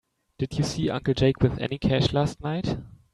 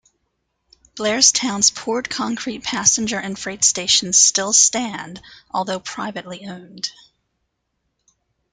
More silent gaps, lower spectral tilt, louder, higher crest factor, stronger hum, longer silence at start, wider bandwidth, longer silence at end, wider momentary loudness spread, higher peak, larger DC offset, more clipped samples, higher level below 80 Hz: neither; first, -6.5 dB/octave vs -0.5 dB/octave; second, -26 LUFS vs -17 LUFS; about the same, 18 dB vs 22 dB; neither; second, 0.4 s vs 0.95 s; about the same, 12 kHz vs 11 kHz; second, 0.2 s vs 1.6 s; second, 9 LU vs 16 LU; second, -6 dBFS vs 0 dBFS; neither; neither; first, -44 dBFS vs -58 dBFS